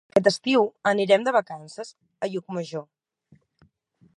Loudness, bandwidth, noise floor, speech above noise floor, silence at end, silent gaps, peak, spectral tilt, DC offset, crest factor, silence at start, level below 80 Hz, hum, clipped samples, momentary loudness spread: -23 LUFS; 11.5 kHz; -63 dBFS; 40 dB; 1.35 s; none; -4 dBFS; -5 dB/octave; under 0.1%; 22 dB; 0.15 s; -72 dBFS; none; under 0.1%; 18 LU